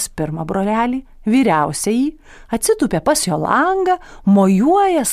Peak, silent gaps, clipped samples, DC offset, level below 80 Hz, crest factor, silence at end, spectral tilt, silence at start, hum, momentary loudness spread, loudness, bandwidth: -2 dBFS; none; under 0.1%; under 0.1%; -42 dBFS; 14 dB; 0 s; -5 dB/octave; 0 s; none; 8 LU; -16 LUFS; 15.5 kHz